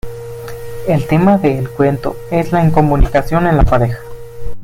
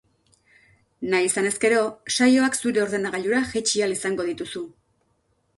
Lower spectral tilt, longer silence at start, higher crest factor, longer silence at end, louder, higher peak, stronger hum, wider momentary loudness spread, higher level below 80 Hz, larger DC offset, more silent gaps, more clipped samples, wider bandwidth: first, -8.5 dB/octave vs -3 dB/octave; second, 0.05 s vs 1 s; about the same, 14 dB vs 18 dB; second, 0 s vs 0.9 s; first, -14 LUFS vs -22 LUFS; first, 0 dBFS vs -6 dBFS; neither; first, 16 LU vs 13 LU; first, -22 dBFS vs -60 dBFS; neither; neither; neither; first, 16 kHz vs 12 kHz